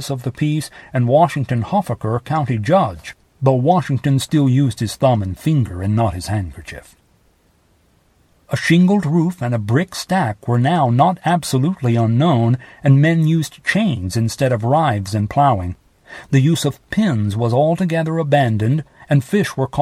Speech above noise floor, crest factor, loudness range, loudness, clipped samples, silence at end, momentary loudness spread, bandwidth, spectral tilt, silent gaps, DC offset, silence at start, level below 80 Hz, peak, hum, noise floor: 41 dB; 16 dB; 4 LU; -17 LUFS; under 0.1%; 0 s; 8 LU; 14 kHz; -7 dB/octave; none; under 0.1%; 0 s; -48 dBFS; 0 dBFS; none; -57 dBFS